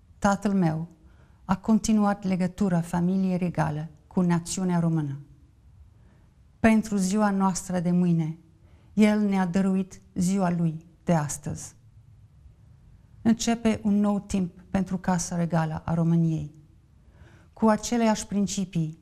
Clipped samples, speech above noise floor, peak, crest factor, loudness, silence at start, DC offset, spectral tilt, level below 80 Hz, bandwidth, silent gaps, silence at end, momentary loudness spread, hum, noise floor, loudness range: under 0.1%; 32 dB; -6 dBFS; 20 dB; -26 LUFS; 0.2 s; under 0.1%; -6.5 dB/octave; -50 dBFS; 13.5 kHz; none; 0.05 s; 10 LU; none; -56 dBFS; 4 LU